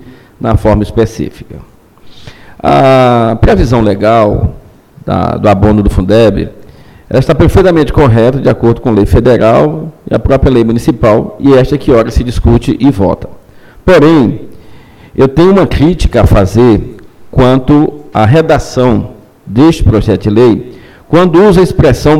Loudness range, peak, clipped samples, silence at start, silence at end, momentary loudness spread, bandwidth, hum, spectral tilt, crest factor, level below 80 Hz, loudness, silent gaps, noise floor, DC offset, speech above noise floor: 2 LU; 0 dBFS; 0.4%; 0.05 s; 0 s; 10 LU; 15 kHz; none; -8 dB/octave; 8 dB; -20 dBFS; -8 LUFS; none; -34 dBFS; under 0.1%; 27 dB